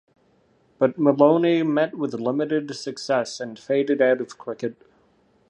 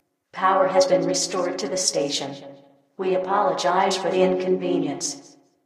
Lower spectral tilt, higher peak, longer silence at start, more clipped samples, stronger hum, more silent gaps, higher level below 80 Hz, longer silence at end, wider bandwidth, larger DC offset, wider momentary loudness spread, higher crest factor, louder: first, -6 dB/octave vs -3.5 dB/octave; about the same, -2 dBFS vs -4 dBFS; first, 0.8 s vs 0.35 s; neither; neither; neither; about the same, -72 dBFS vs -70 dBFS; first, 0.75 s vs 0.45 s; second, 10.5 kHz vs 13.5 kHz; neither; first, 14 LU vs 11 LU; about the same, 20 dB vs 18 dB; about the same, -22 LUFS vs -22 LUFS